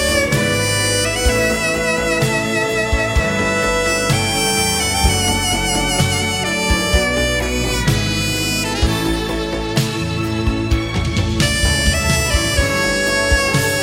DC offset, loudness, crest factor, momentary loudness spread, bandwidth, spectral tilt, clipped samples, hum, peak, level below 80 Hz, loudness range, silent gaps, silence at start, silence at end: under 0.1%; -16 LUFS; 16 dB; 4 LU; 17 kHz; -3.5 dB/octave; under 0.1%; none; 0 dBFS; -26 dBFS; 3 LU; none; 0 s; 0 s